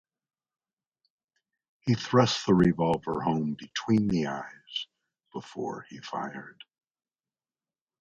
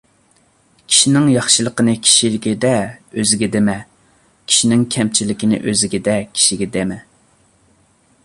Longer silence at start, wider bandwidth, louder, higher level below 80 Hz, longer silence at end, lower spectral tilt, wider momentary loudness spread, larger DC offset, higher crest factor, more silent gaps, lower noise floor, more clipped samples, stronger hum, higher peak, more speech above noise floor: first, 1.85 s vs 0.9 s; second, 8.6 kHz vs 11.5 kHz; second, -28 LUFS vs -14 LUFS; second, -58 dBFS vs -50 dBFS; first, 1.5 s vs 1.25 s; first, -6 dB/octave vs -3 dB/octave; first, 18 LU vs 9 LU; neither; first, 24 dB vs 18 dB; neither; first, under -90 dBFS vs -56 dBFS; neither; neither; second, -6 dBFS vs 0 dBFS; first, over 63 dB vs 40 dB